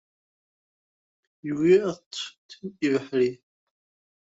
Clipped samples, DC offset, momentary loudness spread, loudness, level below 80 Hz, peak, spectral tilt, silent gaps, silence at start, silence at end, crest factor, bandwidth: under 0.1%; under 0.1%; 19 LU; -25 LUFS; -70 dBFS; -8 dBFS; -6 dB/octave; 2.06-2.11 s, 2.38-2.49 s; 1.45 s; 0.85 s; 20 dB; 8 kHz